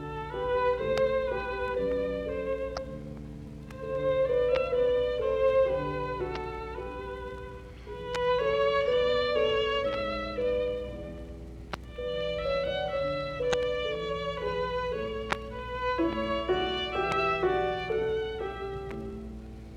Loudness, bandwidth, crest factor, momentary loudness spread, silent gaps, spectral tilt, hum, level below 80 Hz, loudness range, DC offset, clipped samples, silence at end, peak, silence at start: -30 LUFS; 9.8 kHz; 22 dB; 15 LU; none; -5.5 dB/octave; none; -46 dBFS; 4 LU; under 0.1%; under 0.1%; 0 s; -8 dBFS; 0 s